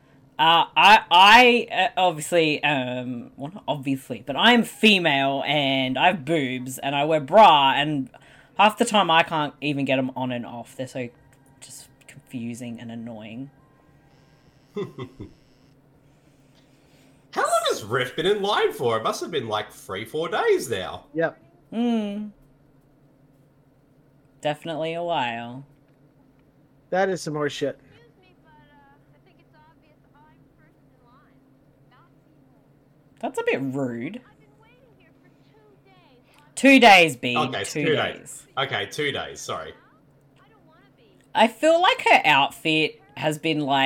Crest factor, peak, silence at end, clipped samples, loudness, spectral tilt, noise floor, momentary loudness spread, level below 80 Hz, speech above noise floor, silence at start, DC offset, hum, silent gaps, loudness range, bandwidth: 18 dB; -4 dBFS; 0 s; under 0.1%; -20 LUFS; -4 dB/octave; -58 dBFS; 21 LU; -62 dBFS; 37 dB; 0.4 s; under 0.1%; none; none; 18 LU; 18 kHz